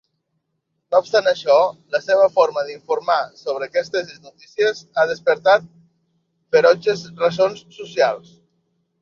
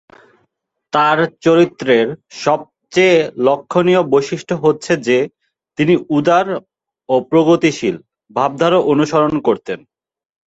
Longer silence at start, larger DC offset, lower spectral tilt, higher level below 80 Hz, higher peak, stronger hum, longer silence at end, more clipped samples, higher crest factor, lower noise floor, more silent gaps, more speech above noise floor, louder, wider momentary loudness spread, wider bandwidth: about the same, 0.9 s vs 0.95 s; neither; second, -4 dB/octave vs -6 dB/octave; second, -68 dBFS vs -56 dBFS; about the same, -2 dBFS vs 0 dBFS; neither; first, 0.85 s vs 0.7 s; neither; about the same, 18 dB vs 14 dB; first, -74 dBFS vs -68 dBFS; neither; about the same, 55 dB vs 54 dB; second, -19 LUFS vs -15 LUFS; about the same, 11 LU vs 9 LU; second, 7.2 kHz vs 8 kHz